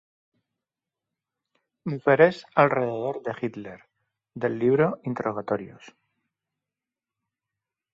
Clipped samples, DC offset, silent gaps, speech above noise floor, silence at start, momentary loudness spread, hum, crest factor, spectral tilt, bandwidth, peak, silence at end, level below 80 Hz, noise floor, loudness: under 0.1%; under 0.1%; none; 65 dB; 1.85 s; 16 LU; none; 24 dB; -8 dB/octave; 7.4 kHz; -4 dBFS; 2.25 s; -68 dBFS; -90 dBFS; -24 LUFS